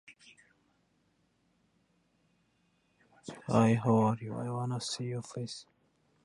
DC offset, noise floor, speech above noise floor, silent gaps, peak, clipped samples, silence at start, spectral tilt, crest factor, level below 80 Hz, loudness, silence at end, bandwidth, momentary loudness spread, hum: under 0.1%; -74 dBFS; 43 dB; none; -12 dBFS; under 0.1%; 0.1 s; -6.5 dB/octave; 22 dB; -70 dBFS; -32 LUFS; 0.6 s; 11.5 kHz; 19 LU; none